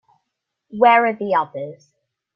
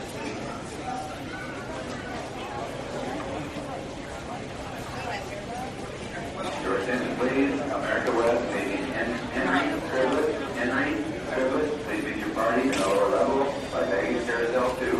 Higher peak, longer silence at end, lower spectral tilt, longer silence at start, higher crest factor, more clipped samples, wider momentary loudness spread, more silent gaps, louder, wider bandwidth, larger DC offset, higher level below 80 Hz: first, -2 dBFS vs -10 dBFS; first, 0.6 s vs 0 s; first, -7 dB/octave vs -5 dB/octave; first, 0.7 s vs 0 s; about the same, 18 dB vs 18 dB; neither; first, 20 LU vs 11 LU; neither; first, -17 LUFS vs -28 LUFS; second, 6.6 kHz vs 13.5 kHz; neither; second, -70 dBFS vs -50 dBFS